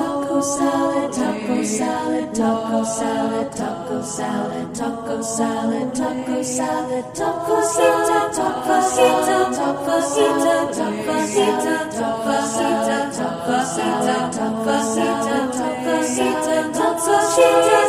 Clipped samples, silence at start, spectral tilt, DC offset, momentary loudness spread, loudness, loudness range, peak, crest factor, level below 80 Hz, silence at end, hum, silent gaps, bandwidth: under 0.1%; 0 s; -3.5 dB/octave; under 0.1%; 8 LU; -20 LUFS; 5 LU; -2 dBFS; 18 dB; -56 dBFS; 0 s; none; none; 15.5 kHz